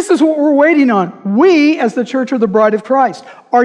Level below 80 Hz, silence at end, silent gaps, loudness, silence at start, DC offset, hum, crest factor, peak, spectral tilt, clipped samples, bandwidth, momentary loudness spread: -62 dBFS; 0 s; none; -12 LUFS; 0 s; under 0.1%; none; 10 dB; 0 dBFS; -6 dB/octave; under 0.1%; 11 kHz; 7 LU